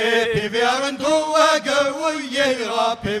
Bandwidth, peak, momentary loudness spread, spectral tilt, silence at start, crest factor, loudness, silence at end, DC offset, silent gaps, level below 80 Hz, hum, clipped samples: 14.5 kHz; -2 dBFS; 5 LU; -3 dB/octave; 0 s; 16 dB; -19 LUFS; 0 s; under 0.1%; none; -52 dBFS; none; under 0.1%